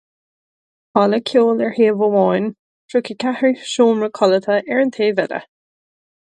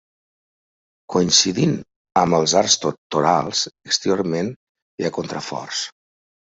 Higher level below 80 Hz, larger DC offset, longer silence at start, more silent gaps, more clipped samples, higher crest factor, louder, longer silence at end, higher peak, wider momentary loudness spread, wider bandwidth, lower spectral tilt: second, -68 dBFS vs -58 dBFS; neither; second, 0.95 s vs 1.1 s; second, 2.59-2.89 s vs 1.96-2.05 s, 2.98-3.10 s, 4.56-4.75 s, 4.82-4.98 s; neither; about the same, 18 dB vs 20 dB; first, -17 LUFS vs -20 LUFS; first, 0.9 s vs 0.6 s; about the same, 0 dBFS vs -2 dBFS; second, 7 LU vs 12 LU; first, 9.8 kHz vs 8.2 kHz; first, -5.5 dB/octave vs -3.5 dB/octave